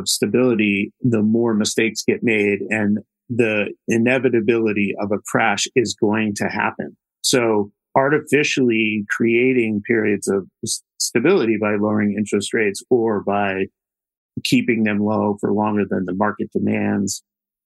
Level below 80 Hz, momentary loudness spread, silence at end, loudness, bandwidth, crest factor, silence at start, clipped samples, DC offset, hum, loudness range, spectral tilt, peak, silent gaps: -66 dBFS; 6 LU; 0.45 s; -19 LUFS; 12.5 kHz; 18 dB; 0 s; under 0.1%; under 0.1%; none; 2 LU; -4.5 dB/octave; -2 dBFS; 14.17-14.29 s